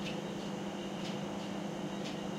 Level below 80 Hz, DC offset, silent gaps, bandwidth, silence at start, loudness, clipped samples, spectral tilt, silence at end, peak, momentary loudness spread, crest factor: -68 dBFS; under 0.1%; none; 15.5 kHz; 0 s; -40 LUFS; under 0.1%; -5 dB/octave; 0 s; -26 dBFS; 1 LU; 14 dB